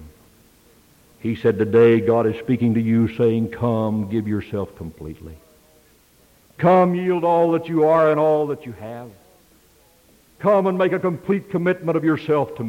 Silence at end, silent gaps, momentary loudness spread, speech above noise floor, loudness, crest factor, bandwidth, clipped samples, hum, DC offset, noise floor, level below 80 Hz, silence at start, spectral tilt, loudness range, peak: 0 s; none; 16 LU; 36 dB; -19 LUFS; 14 dB; 16.5 kHz; under 0.1%; none; under 0.1%; -55 dBFS; -54 dBFS; 0 s; -9 dB/octave; 5 LU; -6 dBFS